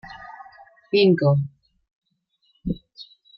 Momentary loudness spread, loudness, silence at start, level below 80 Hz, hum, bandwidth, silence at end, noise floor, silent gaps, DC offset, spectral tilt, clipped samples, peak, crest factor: 26 LU; -21 LUFS; 0.05 s; -50 dBFS; none; 5.8 kHz; 0.35 s; -68 dBFS; 1.96-2.01 s; under 0.1%; -9.5 dB/octave; under 0.1%; -6 dBFS; 20 dB